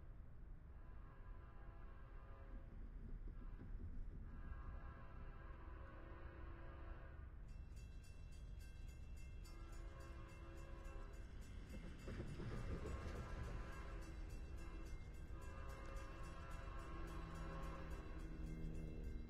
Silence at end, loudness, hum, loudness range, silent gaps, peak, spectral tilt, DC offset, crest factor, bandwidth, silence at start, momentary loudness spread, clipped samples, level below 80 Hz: 0 s; -56 LUFS; none; 6 LU; none; -36 dBFS; -6.5 dB/octave; under 0.1%; 16 dB; 14 kHz; 0 s; 9 LU; under 0.1%; -54 dBFS